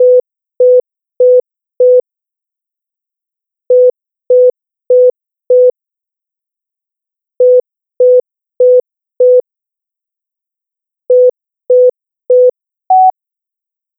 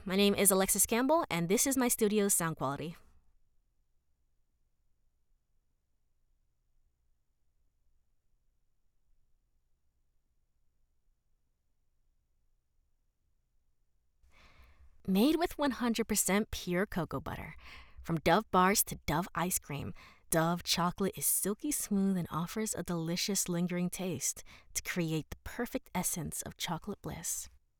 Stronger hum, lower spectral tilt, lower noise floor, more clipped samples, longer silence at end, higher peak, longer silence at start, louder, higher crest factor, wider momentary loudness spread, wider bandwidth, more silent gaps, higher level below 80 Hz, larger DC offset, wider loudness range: neither; first, -11 dB/octave vs -3.5 dB/octave; first, -84 dBFS vs -75 dBFS; neither; first, 0.9 s vs 0.3 s; first, -2 dBFS vs -12 dBFS; about the same, 0 s vs 0 s; first, -10 LUFS vs -32 LUFS; second, 10 dB vs 24 dB; second, 3 LU vs 13 LU; second, 1 kHz vs over 20 kHz; neither; second, -76 dBFS vs -58 dBFS; neither; second, 2 LU vs 6 LU